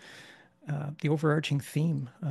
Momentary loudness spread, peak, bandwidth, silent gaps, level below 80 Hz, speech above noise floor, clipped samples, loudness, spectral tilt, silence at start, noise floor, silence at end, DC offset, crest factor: 21 LU; -12 dBFS; 12.5 kHz; none; -72 dBFS; 24 dB; under 0.1%; -30 LUFS; -7 dB/octave; 0 s; -54 dBFS; 0 s; under 0.1%; 18 dB